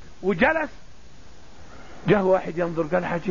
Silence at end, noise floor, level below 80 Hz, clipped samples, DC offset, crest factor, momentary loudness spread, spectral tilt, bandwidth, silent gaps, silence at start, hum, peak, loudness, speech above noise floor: 0 s; -48 dBFS; -48 dBFS; under 0.1%; 1%; 20 dB; 8 LU; -7.5 dB/octave; 7.4 kHz; none; 0 s; none; -4 dBFS; -23 LUFS; 26 dB